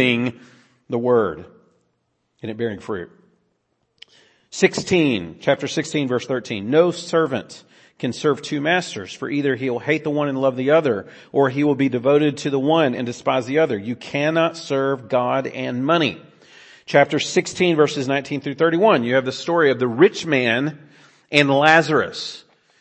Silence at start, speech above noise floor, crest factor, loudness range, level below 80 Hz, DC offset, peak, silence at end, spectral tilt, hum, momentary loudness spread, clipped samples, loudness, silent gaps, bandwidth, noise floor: 0 s; 51 dB; 20 dB; 6 LU; -64 dBFS; under 0.1%; 0 dBFS; 0.4 s; -5 dB/octave; none; 11 LU; under 0.1%; -20 LUFS; none; 8.8 kHz; -70 dBFS